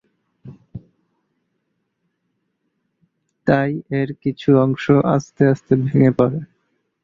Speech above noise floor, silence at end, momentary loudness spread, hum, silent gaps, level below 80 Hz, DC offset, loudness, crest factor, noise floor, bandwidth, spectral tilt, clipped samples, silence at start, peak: 56 dB; 0.6 s; 9 LU; none; none; -54 dBFS; under 0.1%; -18 LUFS; 18 dB; -72 dBFS; 7.2 kHz; -8.5 dB/octave; under 0.1%; 0.45 s; -2 dBFS